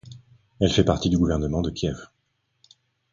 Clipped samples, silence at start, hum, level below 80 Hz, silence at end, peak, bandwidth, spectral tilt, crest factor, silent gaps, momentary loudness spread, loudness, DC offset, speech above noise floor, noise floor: under 0.1%; 0.05 s; none; -38 dBFS; 1.1 s; -4 dBFS; 7.6 kHz; -6 dB/octave; 20 dB; none; 9 LU; -23 LUFS; under 0.1%; 51 dB; -73 dBFS